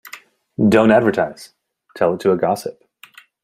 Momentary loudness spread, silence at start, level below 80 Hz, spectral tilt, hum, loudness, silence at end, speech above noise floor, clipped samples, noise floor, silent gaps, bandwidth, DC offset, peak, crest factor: 21 LU; 0.05 s; -58 dBFS; -6.5 dB/octave; none; -17 LUFS; 0.75 s; 31 dB; under 0.1%; -47 dBFS; none; 15.5 kHz; under 0.1%; -2 dBFS; 18 dB